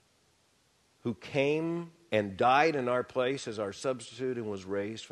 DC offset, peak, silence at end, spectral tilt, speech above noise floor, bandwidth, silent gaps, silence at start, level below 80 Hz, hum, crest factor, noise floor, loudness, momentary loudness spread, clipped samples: under 0.1%; -10 dBFS; 0.05 s; -5.5 dB/octave; 38 dB; 12 kHz; none; 1.05 s; -72 dBFS; none; 22 dB; -69 dBFS; -31 LUFS; 11 LU; under 0.1%